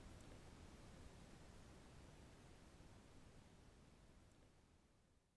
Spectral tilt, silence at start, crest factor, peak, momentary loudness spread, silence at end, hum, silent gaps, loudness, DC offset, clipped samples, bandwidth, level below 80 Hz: -5 dB/octave; 0 s; 16 dB; -48 dBFS; 6 LU; 0 s; none; none; -65 LUFS; under 0.1%; under 0.1%; 11 kHz; -68 dBFS